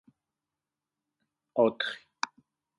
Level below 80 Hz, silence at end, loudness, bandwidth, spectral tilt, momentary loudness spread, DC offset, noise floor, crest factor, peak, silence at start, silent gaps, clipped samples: -82 dBFS; 0.55 s; -31 LUFS; 11 kHz; -4 dB/octave; 11 LU; under 0.1%; -90 dBFS; 24 dB; -10 dBFS; 1.55 s; none; under 0.1%